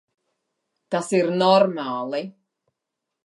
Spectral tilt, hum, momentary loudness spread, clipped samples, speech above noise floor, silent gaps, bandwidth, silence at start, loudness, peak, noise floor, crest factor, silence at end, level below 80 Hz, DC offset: -5.5 dB/octave; none; 13 LU; under 0.1%; 62 dB; none; 11.5 kHz; 0.9 s; -21 LUFS; -4 dBFS; -83 dBFS; 20 dB; 0.95 s; -78 dBFS; under 0.1%